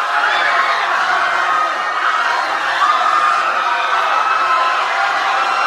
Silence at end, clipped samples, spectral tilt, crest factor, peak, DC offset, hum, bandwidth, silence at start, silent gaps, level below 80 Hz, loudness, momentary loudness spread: 0 s; under 0.1%; 0 dB/octave; 14 dB; -2 dBFS; under 0.1%; none; 13 kHz; 0 s; none; -64 dBFS; -14 LUFS; 3 LU